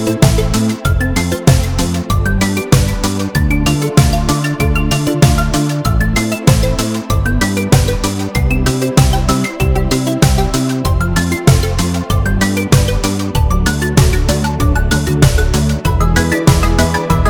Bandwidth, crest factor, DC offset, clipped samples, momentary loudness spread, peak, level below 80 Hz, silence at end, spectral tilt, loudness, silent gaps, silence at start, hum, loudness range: over 20 kHz; 12 dB; under 0.1%; under 0.1%; 4 LU; 0 dBFS; -18 dBFS; 0 s; -5.5 dB/octave; -14 LUFS; none; 0 s; none; 1 LU